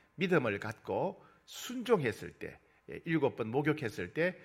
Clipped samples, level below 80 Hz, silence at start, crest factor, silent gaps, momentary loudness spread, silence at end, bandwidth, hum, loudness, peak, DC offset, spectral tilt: under 0.1%; -70 dBFS; 0.2 s; 20 dB; none; 17 LU; 0 s; 16 kHz; none; -34 LUFS; -14 dBFS; under 0.1%; -6 dB/octave